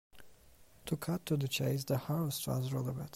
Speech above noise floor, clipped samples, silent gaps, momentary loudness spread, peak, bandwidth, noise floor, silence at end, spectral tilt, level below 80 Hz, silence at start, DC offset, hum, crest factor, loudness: 26 dB; under 0.1%; none; 5 LU; -20 dBFS; 16 kHz; -61 dBFS; 0 s; -5.5 dB/octave; -64 dBFS; 0.15 s; under 0.1%; none; 16 dB; -36 LUFS